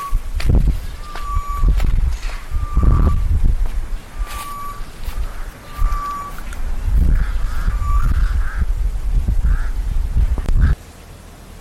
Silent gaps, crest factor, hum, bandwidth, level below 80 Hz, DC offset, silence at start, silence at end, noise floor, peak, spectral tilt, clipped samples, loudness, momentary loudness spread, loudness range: none; 14 dB; none; 13.5 kHz; -18 dBFS; under 0.1%; 0 s; 0 s; -38 dBFS; -2 dBFS; -6.5 dB/octave; under 0.1%; -22 LUFS; 13 LU; 5 LU